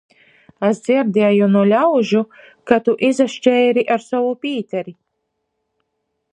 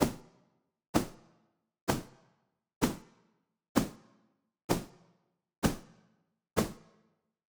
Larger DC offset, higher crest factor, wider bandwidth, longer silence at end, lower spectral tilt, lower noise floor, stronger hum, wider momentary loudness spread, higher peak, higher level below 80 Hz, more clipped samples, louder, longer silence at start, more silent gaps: neither; second, 16 dB vs 28 dB; second, 10 kHz vs over 20 kHz; first, 1.4 s vs 0.75 s; first, -6.5 dB/octave vs -5 dB/octave; about the same, -73 dBFS vs -75 dBFS; neither; second, 10 LU vs 18 LU; first, 0 dBFS vs -10 dBFS; second, -64 dBFS vs -52 dBFS; neither; first, -16 LUFS vs -35 LUFS; first, 0.6 s vs 0 s; second, none vs 0.88-0.93 s, 1.81-1.87 s, 2.76-2.81 s, 3.69-3.75 s, 4.64-4.69 s, 5.58-5.62 s